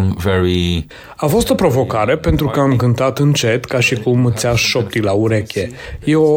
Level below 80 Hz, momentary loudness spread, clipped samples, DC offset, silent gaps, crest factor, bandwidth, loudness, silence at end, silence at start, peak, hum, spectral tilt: -32 dBFS; 7 LU; under 0.1%; under 0.1%; none; 12 dB; 17 kHz; -15 LUFS; 0 s; 0 s; -2 dBFS; none; -5.5 dB/octave